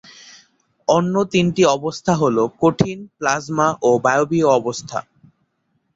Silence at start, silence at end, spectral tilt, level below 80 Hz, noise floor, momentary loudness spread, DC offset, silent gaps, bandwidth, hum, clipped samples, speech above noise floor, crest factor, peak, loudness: 0.9 s; 0.95 s; -5.5 dB/octave; -54 dBFS; -68 dBFS; 9 LU; under 0.1%; none; 8 kHz; none; under 0.1%; 51 dB; 18 dB; -2 dBFS; -18 LUFS